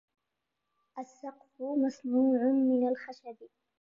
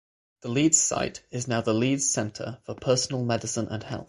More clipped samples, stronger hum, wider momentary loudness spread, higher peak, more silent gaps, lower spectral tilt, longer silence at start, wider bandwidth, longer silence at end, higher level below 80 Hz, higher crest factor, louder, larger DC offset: neither; neither; first, 20 LU vs 13 LU; second, -18 dBFS vs -6 dBFS; neither; first, -6.5 dB/octave vs -3.5 dB/octave; first, 0.95 s vs 0.45 s; second, 7.2 kHz vs 11.5 kHz; first, 0.35 s vs 0.05 s; second, -86 dBFS vs -58 dBFS; second, 14 dB vs 20 dB; second, -29 LUFS vs -25 LUFS; neither